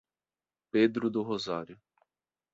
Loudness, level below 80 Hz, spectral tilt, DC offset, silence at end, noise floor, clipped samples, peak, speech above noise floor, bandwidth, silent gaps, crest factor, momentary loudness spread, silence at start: -30 LUFS; -72 dBFS; -6 dB/octave; under 0.1%; 0.8 s; under -90 dBFS; under 0.1%; -12 dBFS; over 60 dB; 7.8 kHz; none; 20 dB; 11 LU; 0.75 s